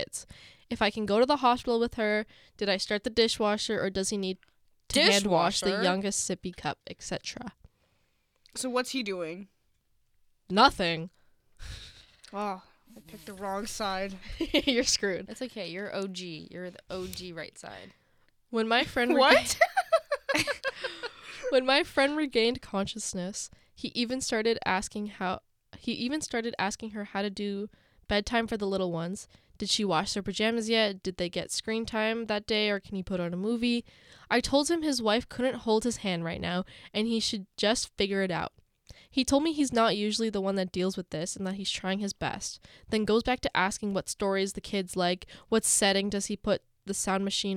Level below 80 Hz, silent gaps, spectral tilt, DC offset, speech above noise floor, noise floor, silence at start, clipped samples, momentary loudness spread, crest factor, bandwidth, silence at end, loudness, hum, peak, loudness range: -54 dBFS; none; -3.5 dB/octave; under 0.1%; 42 dB; -71 dBFS; 0 s; under 0.1%; 15 LU; 24 dB; 16.5 kHz; 0 s; -29 LUFS; none; -6 dBFS; 7 LU